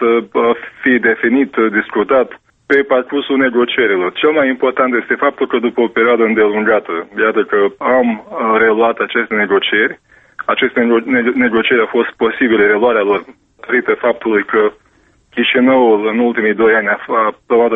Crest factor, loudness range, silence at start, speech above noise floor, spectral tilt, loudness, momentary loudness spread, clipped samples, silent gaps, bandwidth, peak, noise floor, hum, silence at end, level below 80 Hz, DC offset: 12 dB; 1 LU; 0 s; 40 dB; -7.5 dB/octave; -13 LUFS; 5 LU; under 0.1%; none; 3.9 kHz; 0 dBFS; -53 dBFS; none; 0 s; -54 dBFS; under 0.1%